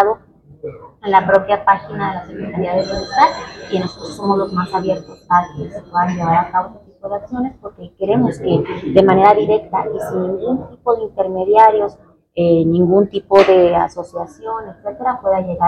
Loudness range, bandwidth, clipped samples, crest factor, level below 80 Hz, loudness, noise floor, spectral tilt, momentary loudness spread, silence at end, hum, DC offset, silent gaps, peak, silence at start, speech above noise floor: 5 LU; 12 kHz; under 0.1%; 16 dB; -46 dBFS; -16 LUFS; -43 dBFS; -7 dB/octave; 16 LU; 0 s; none; under 0.1%; none; 0 dBFS; 0 s; 28 dB